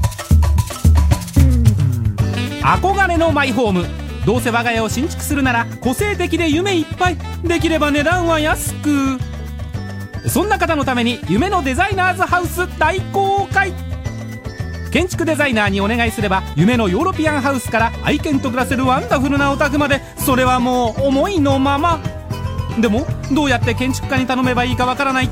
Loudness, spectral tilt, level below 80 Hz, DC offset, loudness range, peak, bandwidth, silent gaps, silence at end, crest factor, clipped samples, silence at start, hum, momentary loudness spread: -16 LUFS; -5.5 dB/octave; -26 dBFS; under 0.1%; 3 LU; 0 dBFS; 16 kHz; none; 0 s; 16 dB; under 0.1%; 0 s; none; 8 LU